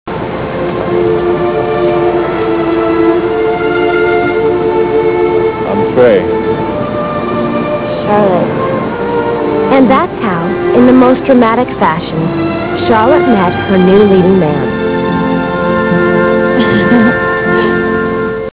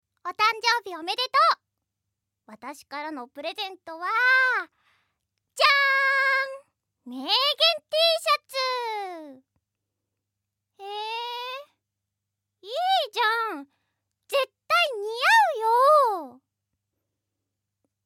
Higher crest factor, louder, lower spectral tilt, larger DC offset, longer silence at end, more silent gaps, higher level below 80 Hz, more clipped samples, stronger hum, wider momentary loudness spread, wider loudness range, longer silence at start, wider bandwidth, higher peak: second, 10 dB vs 22 dB; first, -10 LUFS vs -23 LUFS; first, -11 dB/octave vs 0.5 dB/octave; first, 0.4% vs under 0.1%; second, 0.05 s vs 1.75 s; neither; first, -36 dBFS vs -88 dBFS; first, 0.8% vs under 0.1%; neither; second, 7 LU vs 19 LU; second, 3 LU vs 11 LU; second, 0.05 s vs 0.25 s; second, 4 kHz vs 16.5 kHz; first, 0 dBFS vs -4 dBFS